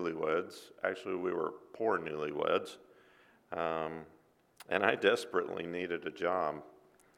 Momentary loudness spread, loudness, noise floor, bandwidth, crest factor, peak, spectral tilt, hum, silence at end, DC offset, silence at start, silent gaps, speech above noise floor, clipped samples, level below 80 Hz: 12 LU; -35 LUFS; -64 dBFS; 15.5 kHz; 26 dB; -10 dBFS; -5 dB/octave; none; 0.45 s; under 0.1%; 0 s; none; 30 dB; under 0.1%; -74 dBFS